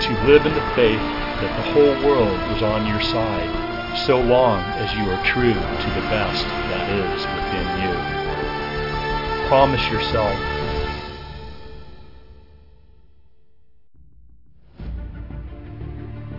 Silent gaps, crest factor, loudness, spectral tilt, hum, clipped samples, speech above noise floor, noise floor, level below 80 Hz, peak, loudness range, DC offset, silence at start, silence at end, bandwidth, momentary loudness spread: none; 20 dB; -20 LUFS; -7 dB/octave; none; under 0.1%; 43 dB; -62 dBFS; -34 dBFS; -2 dBFS; 19 LU; under 0.1%; 0 s; 0 s; 5.8 kHz; 19 LU